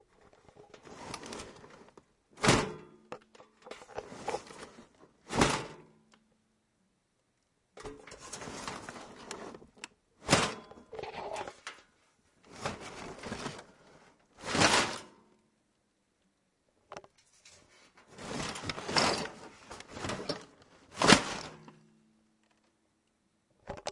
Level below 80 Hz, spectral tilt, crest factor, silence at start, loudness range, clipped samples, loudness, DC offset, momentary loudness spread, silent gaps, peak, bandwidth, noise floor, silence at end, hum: -58 dBFS; -3 dB/octave; 34 dB; 0.6 s; 14 LU; under 0.1%; -32 LUFS; under 0.1%; 23 LU; none; -2 dBFS; 11.5 kHz; -76 dBFS; 0 s; none